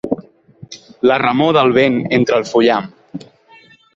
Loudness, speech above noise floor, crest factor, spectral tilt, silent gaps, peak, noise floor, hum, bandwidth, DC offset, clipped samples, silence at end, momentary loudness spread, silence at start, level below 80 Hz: -14 LUFS; 33 dB; 14 dB; -6 dB/octave; none; -2 dBFS; -47 dBFS; none; 7.6 kHz; under 0.1%; under 0.1%; 0.75 s; 22 LU; 0.05 s; -54 dBFS